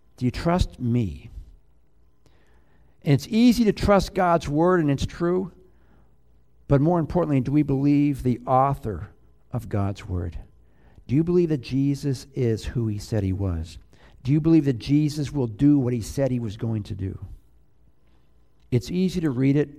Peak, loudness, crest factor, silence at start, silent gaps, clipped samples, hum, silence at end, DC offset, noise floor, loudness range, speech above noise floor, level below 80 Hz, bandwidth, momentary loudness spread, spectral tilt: -6 dBFS; -23 LUFS; 18 dB; 0.2 s; none; under 0.1%; none; 0.05 s; 0.2%; -62 dBFS; 5 LU; 40 dB; -40 dBFS; 15 kHz; 13 LU; -7.5 dB/octave